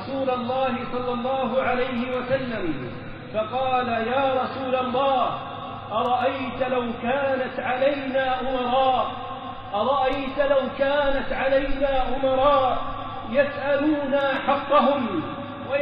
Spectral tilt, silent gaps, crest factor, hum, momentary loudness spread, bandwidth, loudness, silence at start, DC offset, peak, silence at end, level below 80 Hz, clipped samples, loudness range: -3 dB/octave; none; 16 dB; none; 9 LU; 5.2 kHz; -24 LUFS; 0 s; under 0.1%; -8 dBFS; 0 s; -42 dBFS; under 0.1%; 3 LU